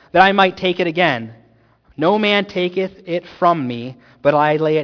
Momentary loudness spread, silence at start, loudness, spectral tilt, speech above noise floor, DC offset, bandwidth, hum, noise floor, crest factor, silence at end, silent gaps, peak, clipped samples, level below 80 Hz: 12 LU; 0.15 s; -17 LUFS; -6.5 dB/octave; 37 dB; under 0.1%; 5.4 kHz; none; -53 dBFS; 18 dB; 0 s; none; 0 dBFS; under 0.1%; -56 dBFS